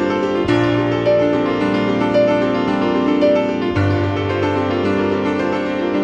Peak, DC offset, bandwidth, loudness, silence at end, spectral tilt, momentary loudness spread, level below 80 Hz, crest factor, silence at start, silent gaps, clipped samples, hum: -2 dBFS; under 0.1%; 8.2 kHz; -17 LUFS; 0 s; -7.5 dB/octave; 4 LU; -44 dBFS; 14 dB; 0 s; none; under 0.1%; none